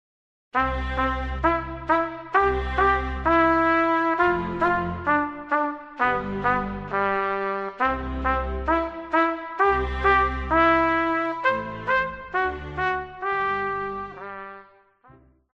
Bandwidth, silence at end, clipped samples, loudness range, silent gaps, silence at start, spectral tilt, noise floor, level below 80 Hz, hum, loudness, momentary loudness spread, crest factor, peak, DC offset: 7.8 kHz; 0.9 s; under 0.1%; 4 LU; none; 0.55 s; -7.5 dB/octave; -54 dBFS; -38 dBFS; none; -23 LUFS; 8 LU; 18 dB; -6 dBFS; under 0.1%